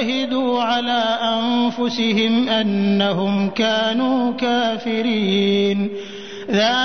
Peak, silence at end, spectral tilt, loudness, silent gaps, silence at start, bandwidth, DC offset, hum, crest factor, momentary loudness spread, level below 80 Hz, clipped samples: -6 dBFS; 0 s; -5.5 dB/octave; -19 LUFS; none; 0 s; 6.6 kHz; 0.6%; none; 12 dB; 4 LU; -60 dBFS; under 0.1%